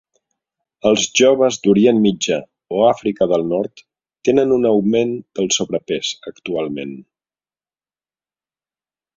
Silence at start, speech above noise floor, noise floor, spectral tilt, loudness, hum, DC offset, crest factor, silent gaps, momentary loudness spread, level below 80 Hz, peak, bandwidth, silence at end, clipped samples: 0.85 s; over 74 dB; under -90 dBFS; -4 dB/octave; -17 LUFS; none; under 0.1%; 18 dB; none; 12 LU; -56 dBFS; -2 dBFS; 7.8 kHz; 2.15 s; under 0.1%